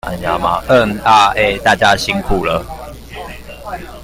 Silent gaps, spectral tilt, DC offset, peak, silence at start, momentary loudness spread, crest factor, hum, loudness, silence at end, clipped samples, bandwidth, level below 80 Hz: none; -4 dB/octave; under 0.1%; 0 dBFS; 0.05 s; 20 LU; 14 dB; none; -13 LUFS; 0 s; under 0.1%; 16.5 kHz; -32 dBFS